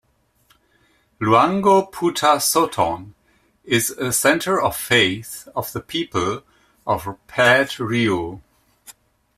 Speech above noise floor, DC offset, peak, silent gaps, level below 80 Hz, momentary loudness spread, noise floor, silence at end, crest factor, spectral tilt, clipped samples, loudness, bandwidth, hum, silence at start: 41 dB; under 0.1%; -2 dBFS; none; -54 dBFS; 13 LU; -60 dBFS; 0.45 s; 18 dB; -3.5 dB/octave; under 0.1%; -19 LUFS; 16 kHz; none; 1.2 s